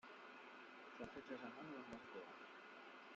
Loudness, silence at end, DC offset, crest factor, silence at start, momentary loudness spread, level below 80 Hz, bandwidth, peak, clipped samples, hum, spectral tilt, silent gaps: -56 LUFS; 0 s; under 0.1%; 22 dB; 0.05 s; 6 LU; -86 dBFS; 7.6 kHz; -34 dBFS; under 0.1%; none; -2.5 dB/octave; none